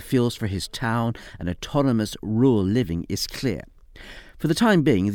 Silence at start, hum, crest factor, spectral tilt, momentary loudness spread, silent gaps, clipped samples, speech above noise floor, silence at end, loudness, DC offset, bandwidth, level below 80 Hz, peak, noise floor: 0 s; none; 18 dB; -6 dB/octave; 13 LU; none; under 0.1%; 21 dB; 0 s; -23 LUFS; under 0.1%; 18.5 kHz; -46 dBFS; -4 dBFS; -43 dBFS